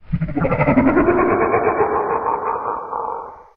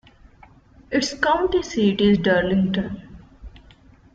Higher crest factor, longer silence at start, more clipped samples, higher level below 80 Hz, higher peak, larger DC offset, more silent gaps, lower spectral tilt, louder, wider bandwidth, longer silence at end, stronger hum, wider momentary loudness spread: about the same, 14 dB vs 18 dB; second, 0.1 s vs 0.9 s; neither; first, -38 dBFS vs -46 dBFS; about the same, -4 dBFS vs -6 dBFS; neither; neither; first, -11.5 dB/octave vs -5.5 dB/octave; about the same, -18 LUFS vs -20 LUFS; second, 4.6 kHz vs 7.8 kHz; second, 0.15 s vs 0.6 s; neither; about the same, 10 LU vs 9 LU